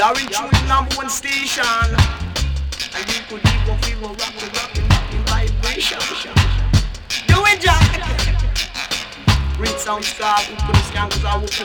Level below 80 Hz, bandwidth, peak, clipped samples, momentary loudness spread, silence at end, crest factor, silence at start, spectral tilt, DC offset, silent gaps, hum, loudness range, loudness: -22 dBFS; 19.5 kHz; -2 dBFS; under 0.1%; 8 LU; 0 s; 14 dB; 0 s; -4 dB/octave; under 0.1%; none; none; 4 LU; -18 LUFS